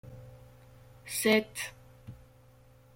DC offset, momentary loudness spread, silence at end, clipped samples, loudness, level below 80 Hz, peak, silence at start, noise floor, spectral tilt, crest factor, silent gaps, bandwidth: under 0.1%; 26 LU; 0.8 s; under 0.1%; -30 LUFS; -62 dBFS; -12 dBFS; 0.05 s; -58 dBFS; -3.5 dB/octave; 22 dB; none; 16.5 kHz